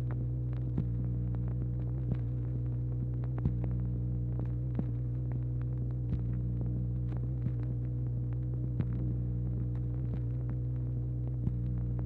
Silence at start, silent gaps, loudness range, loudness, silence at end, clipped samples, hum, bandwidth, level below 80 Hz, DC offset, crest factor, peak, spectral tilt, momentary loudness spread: 0 s; none; 0 LU; -35 LUFS; 0 s; under 0.1%; none; 2.4 kHz; -40 dBFS; under 0.1%; 16 dB; -18 dBFS; -12 dB/octave; 1 LU